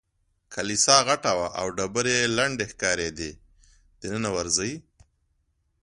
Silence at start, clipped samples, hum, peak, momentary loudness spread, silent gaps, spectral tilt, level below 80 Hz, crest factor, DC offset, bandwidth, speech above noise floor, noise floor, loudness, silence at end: 0.5 s; under 0.1%; none; 0 dBFS; 18 LU; none; -2 dB/octave; -54 dBFS; 26 dB; under 0.1%; 11.5 kHz; 46 dB; -71 dBFS; -24 LUFS; 1.05 s